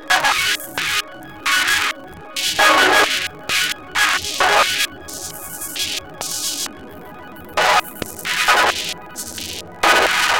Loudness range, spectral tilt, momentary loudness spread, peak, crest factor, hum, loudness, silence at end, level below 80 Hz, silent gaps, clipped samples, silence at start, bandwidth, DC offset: 6 LU; -0.5 dB/octave; 15 LU; 0 dBFS; 18 dB; none; -17 LUFS; 0 s; -48 dBFS; none; under 0.1%; 0 s; 17 kHz; 0.6%